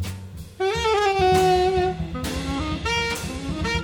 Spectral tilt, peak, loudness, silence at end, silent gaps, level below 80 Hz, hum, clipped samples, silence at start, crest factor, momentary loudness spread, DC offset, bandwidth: -5 dB/octave; -8 dBFS; -22 LUFS; 0 s; none; -36 dBFS; none; under 0.1%; 0 s; 16 dB; 11 LU; under 0.1%; over 20 kHz